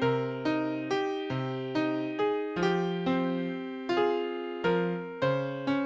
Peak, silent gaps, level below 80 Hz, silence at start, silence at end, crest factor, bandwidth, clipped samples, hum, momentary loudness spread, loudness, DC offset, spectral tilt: -16 dBFS; none; -66 dBFS; 0 s; 0 s; 14 dB; 7.8 kHz; under 0.1%; none; 5 LU; -30 LUFS; under 0.1%; -7 dB/octave